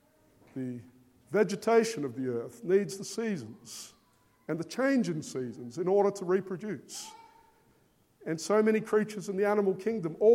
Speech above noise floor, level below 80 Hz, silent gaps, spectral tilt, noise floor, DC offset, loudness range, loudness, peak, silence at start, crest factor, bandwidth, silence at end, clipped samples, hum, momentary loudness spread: 38 dB; -78 dBFS; none; -5.5 dB/octave; -67 dBFS; under 0.1%; 3 LU; -30 LUFS; -12 dBFS; 0.55 s; 18 dB; 16 kHz; 0 s; under 0.1%; none; 17 LU